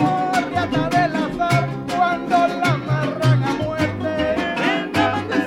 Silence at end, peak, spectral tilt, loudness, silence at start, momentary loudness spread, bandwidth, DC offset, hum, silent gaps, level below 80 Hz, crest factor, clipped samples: 0 s; -6 dBFS; -6.5 dB/octave; -20 LUFS; 0 s; 4 LU; 14.5 kHz; under 0.1%; none; none; -46 dBFS; 14 dB; under 0.1%